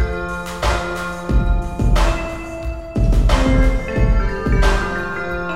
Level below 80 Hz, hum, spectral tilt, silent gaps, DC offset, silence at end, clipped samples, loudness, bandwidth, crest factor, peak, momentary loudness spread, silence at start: -18 dBFS; none; -6 dB/octave; none; under 0.1%; 0 s; under 0.1%; -20 LUFS; 12 kHz; 14 dB; -2 dBFS; 9 LU; 0 s